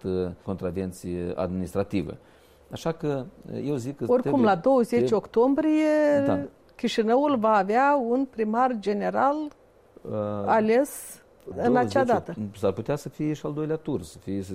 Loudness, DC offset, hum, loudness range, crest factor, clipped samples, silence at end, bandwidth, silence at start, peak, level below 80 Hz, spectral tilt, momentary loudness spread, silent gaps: -25 LUFS; under 0.1%; none; 7 LU; 14 dB; under 0.1%; 0 s; 15.5 kHz; 0.05 s; -10 dBFS; -56 dBFS; -6.5 dB/octave; 12 LU; none